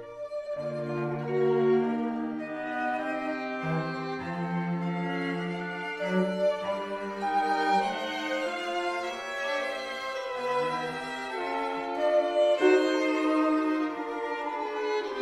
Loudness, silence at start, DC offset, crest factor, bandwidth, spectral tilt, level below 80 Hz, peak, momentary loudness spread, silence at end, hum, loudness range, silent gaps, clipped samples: -29 LUFS; 0 s; under 0.1%; 20 dB; 12.5 kHz; -6 dB/octave; -68 dBFS; -10 dBFS; 9 LU; 0 s; none; 5 LU; none; under 0.1%